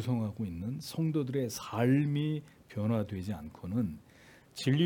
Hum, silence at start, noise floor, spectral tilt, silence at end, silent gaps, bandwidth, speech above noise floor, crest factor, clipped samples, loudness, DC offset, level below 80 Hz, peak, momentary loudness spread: none; 0 s; -58 dBFS; -7 dB/octave; 0 s; none; 18 kHz; 26 dB; 16 dB; under 0.1%; -34 LUFS; under 0.1%; -64 dBFS; -16 dBFS; 12 LU